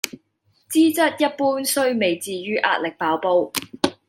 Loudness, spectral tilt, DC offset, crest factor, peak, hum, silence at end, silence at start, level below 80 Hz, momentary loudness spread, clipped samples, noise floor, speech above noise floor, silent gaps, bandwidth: -21 LUFS; -3 dB/octave; under 0.1%; 20 dB; 0 dBFS; none; 0.15 s; 0.05 s; -70 dBFS; 7 LU; under 0.1%; -65 dBFS; 45 dB; none; 16.5 kHz